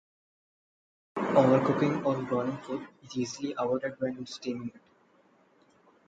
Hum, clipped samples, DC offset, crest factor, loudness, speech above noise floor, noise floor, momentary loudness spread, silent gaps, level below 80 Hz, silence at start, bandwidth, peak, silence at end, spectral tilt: none; under 0.1%; under 0.1%; 22 dB; -30 LUFS; 35 dB; -64 dBFS; 15 LU; none; -70 dBFS; 1.15 s; 7.8 kHz; -8 dBFS; 1.3 s; -6.5 dB/octave